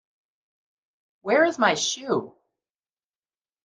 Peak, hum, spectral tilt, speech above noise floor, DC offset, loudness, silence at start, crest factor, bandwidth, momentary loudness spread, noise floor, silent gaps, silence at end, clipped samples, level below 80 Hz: -6 dBFS; none; -2.5 dB/octave; over 68 dB; under 0.1%; -23 LUFS; 1.25 s; 22 dB; 10 kHz; 8 LU; under -90 dBFS; none; 1.35 s; under 0.1%; -78 dBFS